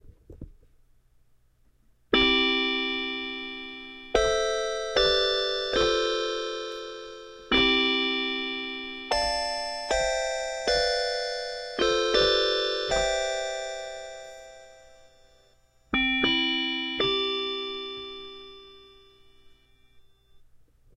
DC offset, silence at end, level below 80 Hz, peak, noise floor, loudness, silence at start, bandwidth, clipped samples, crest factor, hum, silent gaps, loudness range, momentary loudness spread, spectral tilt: under 0.1%; 0.4 s; -48 dBFS; -6 dBFS; -63 dBFS; -25 LUFS; 0.05 s; 12 kHz; under 0.1%; 22 dB; none; none; 6 LU; 17 LU; -2 dB/octave